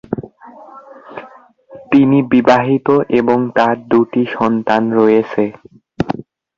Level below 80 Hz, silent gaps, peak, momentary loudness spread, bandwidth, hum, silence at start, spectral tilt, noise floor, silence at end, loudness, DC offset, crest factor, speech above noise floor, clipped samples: -50 dBFS; none; 0 dBFS; 15 LU; 7.2 kHz; none; 0.1 s; -8 dB/octave; -41 dBFS; 0.35 s; -14 LUFS; under 0.1%; 14 dB; 29 dB; under 0.1%